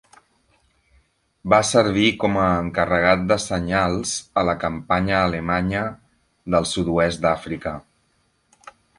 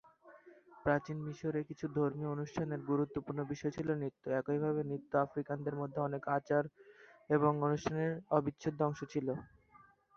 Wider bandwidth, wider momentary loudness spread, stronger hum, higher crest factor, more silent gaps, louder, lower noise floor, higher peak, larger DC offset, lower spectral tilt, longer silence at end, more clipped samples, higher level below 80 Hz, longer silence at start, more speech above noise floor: first, 11.5 kHz vs 7 kHz; first, 11 LU vs 6 LU; neither; about the same, 20 dB vs 22 dB; neither; first, -20 LUFS vs -37 LUFS; about the same, -65 dBFS vs -65 dBFS; first, -2 dBFS vs -14 dBFS; neither; second, -4.5 dB/octave vs -7.5 dB/octave; first, 1.2 s vs 0.7 s; neither; first, -42 dBFS vs -68 dBFS; first, 1.45 s vs 0.25 s; first, 45 dB vs 29 dB